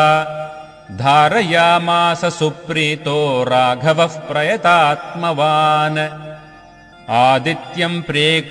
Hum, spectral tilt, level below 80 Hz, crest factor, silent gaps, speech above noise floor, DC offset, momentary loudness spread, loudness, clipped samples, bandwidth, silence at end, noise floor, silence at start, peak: none; -5 dB/octave; -56 dBFS; 16 dB; none; 27 dB; under 0.1%; 10 LU; -15 LUFS; under 0.1%; 13 kHz; 0 s; -42 dBFS; 0 s; 0 dBFS